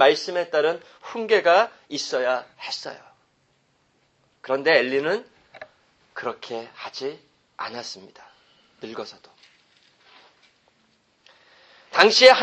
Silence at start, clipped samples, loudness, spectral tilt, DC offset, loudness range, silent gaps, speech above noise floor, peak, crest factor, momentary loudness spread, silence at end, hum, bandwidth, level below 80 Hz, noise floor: 0 s; under 0.1%; -22 LUFS; -2 dB/octave; under 0.1%; 19 LU; none; 44 dB; 0 dBFS; 24 dB; 22 LU; 0 s; none; 8.8 kHz; -72 dBFS; -66 dBFS